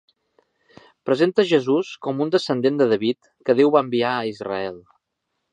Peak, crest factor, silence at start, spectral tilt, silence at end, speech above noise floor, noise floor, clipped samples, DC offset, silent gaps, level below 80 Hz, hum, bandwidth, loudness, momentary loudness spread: -4 dBFS; 18 dB; 1.05 s; -6.5 dB/octave; 0.75 s; 57 dB; -77 dBFS; under 0.1%; under 0.1%; none; -68 dBFS; none; 9.6 kHz; -21 LUFS; 10 LU